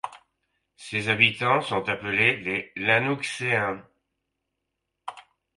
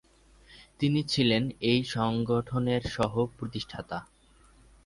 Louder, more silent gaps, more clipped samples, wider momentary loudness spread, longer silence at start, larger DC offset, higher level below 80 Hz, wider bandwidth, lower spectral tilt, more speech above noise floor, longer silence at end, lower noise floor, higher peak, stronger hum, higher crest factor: first, -23 LUFS vs -29 LUFS; neither; neither; first, 21 LU vs 12 LU; second, 0.05 s vs 0.5 s; neither; second, -64 dBFS vs -54 dBFS; about the same, 11.5 kHz vs 11.5 kHz; second, -4.5 dB/octave vs -6 dB/octave; first, 57 dB vs 31 dB; second, 0.35 s vs 0.8 s; first, -81 dBFS vs -59 dBFS; first, -2 dBFS vs -12 dBFS; neither; first, 24 dB vs 18 dB